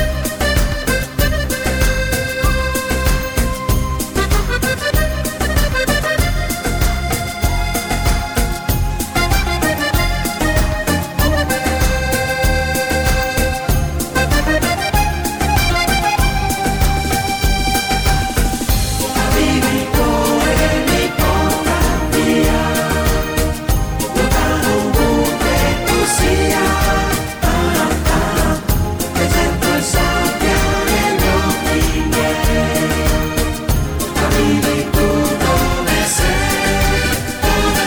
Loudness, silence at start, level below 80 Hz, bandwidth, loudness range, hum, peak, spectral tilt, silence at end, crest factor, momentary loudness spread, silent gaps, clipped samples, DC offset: -16 LUFS; 0 s; -20 dBFS; 19.5 kHz; 3 LU; none; -2 dBFS; -4.5 dB/octave; 0 s; 12 dB; 4 LU; none; under 0.1%; under 0.1%